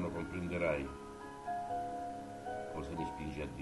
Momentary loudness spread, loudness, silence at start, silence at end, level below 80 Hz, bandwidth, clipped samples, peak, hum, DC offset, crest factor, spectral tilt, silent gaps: 9 LU; -41 LUFS; 0 s; 0 s; -56 dBFS; 11.5 kHz; under 0.1%; -22 dBFS; none; under 0.1%; 18 dB; -6.5 dB/octave; none